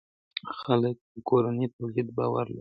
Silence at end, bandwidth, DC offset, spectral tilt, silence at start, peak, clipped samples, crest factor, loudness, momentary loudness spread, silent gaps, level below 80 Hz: 0 s; 5.2 kHz; under 0.1%; -10.5 dB/octave; 0.35 s; -10 dBFS; under 0.1%; 18 dB; -29 LUFS; 12 LU; 1.01-1.15 s, 1.73-1.79 s; -66 dBFS